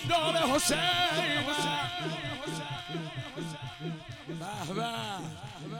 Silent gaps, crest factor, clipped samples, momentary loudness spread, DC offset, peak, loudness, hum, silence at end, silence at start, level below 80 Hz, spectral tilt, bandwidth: none; 18 dB; under 0.1%; 14 LU; under 0.1%; -14 dBFS; -31 LUFS; none; 0 s; 0 s; -58 dBFS; -3.5 dB/octave; 17.5 kHz